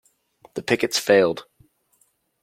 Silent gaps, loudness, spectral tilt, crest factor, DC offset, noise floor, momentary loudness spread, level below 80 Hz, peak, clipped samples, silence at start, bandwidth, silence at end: none; -20 LUFS; -3.5 dB/octave; 22 dB; under 0.1%; -65 dBFS; 16 LU; -66 dBFS; -2 dBFS; under 0.1%; 0.55 s; 16.5 kHz; 1 s